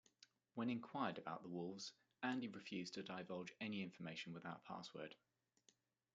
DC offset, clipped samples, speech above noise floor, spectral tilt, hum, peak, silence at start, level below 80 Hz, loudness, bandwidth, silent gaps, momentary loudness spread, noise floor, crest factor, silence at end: under 0.1%; under 0.1%; 31 dB; -5 dB/octave; none; -28 dBFS; 0.2 s; under -90 dBFS; -50 LUFS; 9 kHz; none; 9 LU; -80 dBFS; 22 dB; 1 s